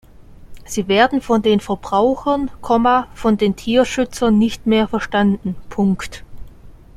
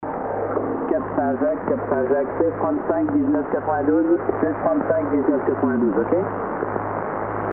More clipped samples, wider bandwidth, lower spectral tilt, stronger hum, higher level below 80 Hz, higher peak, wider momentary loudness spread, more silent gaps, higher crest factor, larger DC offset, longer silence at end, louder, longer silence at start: neither; first, 14 kHz vs 3.1 kHz; first, -5.5 dB/octave vs -3.5 dB/octave; neither; first, -40 dBFS vs -50 dBFS; first, -2 dBFS vs -6 dBFS; first, 9 LU vs 6 LU; neither; about the same, 16 dB vs 16 dB; neither; first, 0.25 s vs 0 s; first, -17 LUFS vs -22 LUFS; first, 0.2 s vs 0 s